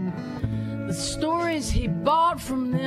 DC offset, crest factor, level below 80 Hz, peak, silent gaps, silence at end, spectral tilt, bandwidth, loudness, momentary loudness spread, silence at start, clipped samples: under 0.1%; 16 dB; -36 dBFS; -10 dBFS; none; 0 s; -5.5 dB/octave; 15 kHz; -25 LUFS; 9 LU; 0 s; under 0.1%